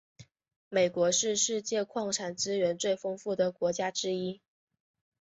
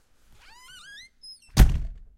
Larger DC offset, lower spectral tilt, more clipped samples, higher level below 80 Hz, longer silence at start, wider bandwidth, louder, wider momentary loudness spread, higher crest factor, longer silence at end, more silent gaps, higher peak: neither; second, -3 dB/octave vs -5.5 dB/octave; neither; second, -74 dBFS vs -26 dBFS; second, 0.2 s vs 1.55 s; second, 8.4 kHz vs 16 kHz; second, -30 LUFS vs -24 LUFS; second, 7 LU vs 24 LU; about the same, 18 dB vs 22 dB; first, 0.85 s vs 0.25 s; first, 0.56-0.71 s vs none; second, -14 dBFS vs -4 dBFS